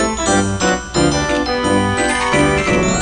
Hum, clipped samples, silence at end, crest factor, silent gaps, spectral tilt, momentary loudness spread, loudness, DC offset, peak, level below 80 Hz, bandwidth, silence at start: none; under 0.1%; 0 s; 14 dB; none; -4 dB/octave; 3 LU; -15 LUFS; under 0.1%; -2 dBFS; -30 dBFS; 9.8 kHz; 0 s